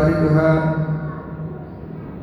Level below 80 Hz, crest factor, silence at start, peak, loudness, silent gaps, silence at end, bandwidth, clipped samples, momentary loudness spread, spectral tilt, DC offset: -38 dBFS; 16 dB; 0 s; -4 dBFS; -19 LUFS; none; 0 s; 5.8 kHz; under 0.1%; 18 LU; -10 dB/octave; under 0.1%